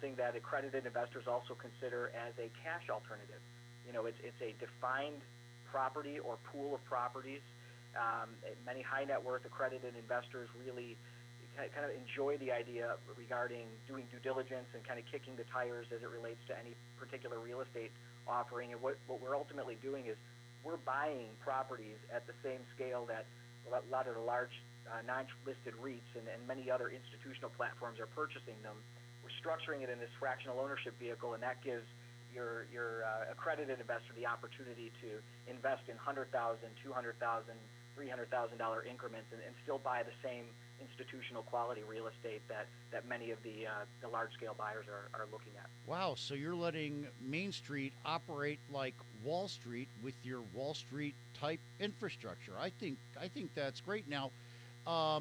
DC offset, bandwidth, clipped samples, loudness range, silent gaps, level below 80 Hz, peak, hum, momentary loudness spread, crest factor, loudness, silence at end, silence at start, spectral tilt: under 0.1%; over 20 kHz; under 0.1%; 3 LU; none; -84 dBFS; -24 dBFS; 60 Hz at -60 dBFS; 11 LU; 20 dB; -44 LUFS; 0 s; 0 s; -5.5 dB/octave